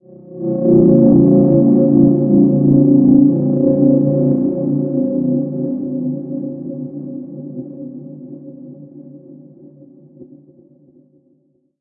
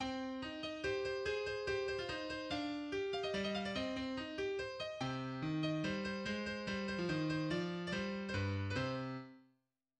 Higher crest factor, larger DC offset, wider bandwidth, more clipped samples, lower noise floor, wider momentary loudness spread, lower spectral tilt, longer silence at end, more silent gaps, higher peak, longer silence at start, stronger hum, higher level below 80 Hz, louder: about the same, 14 dB vs 14 dB; neither; second, 1.4 kHz vs 10 kHz; neither; second, -59 dBFS vs -81 dBFS; first, 21 LU vs 4 LU; first, -16.5 dB/octave vs -5.5 dB/octave; first, 1.55 s vs 0.6 s; neither; first, 0 dBFS vs -26 dBFS; first, 0.3 s vs 0 s; neither; first, -48 dBFS vs -64 dBFS; first, -13 LUFS vs -40 LUFS